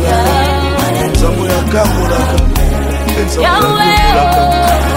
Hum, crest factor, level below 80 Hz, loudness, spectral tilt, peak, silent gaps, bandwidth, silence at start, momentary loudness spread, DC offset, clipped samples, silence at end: none; 10 dB; -16 dBFS; -11 LUFS; -5 dB/octave; 0 dBFS; none; 16.5 kHz; 0 s; 5 LU; under 0.1%; under 0.1%; 0 s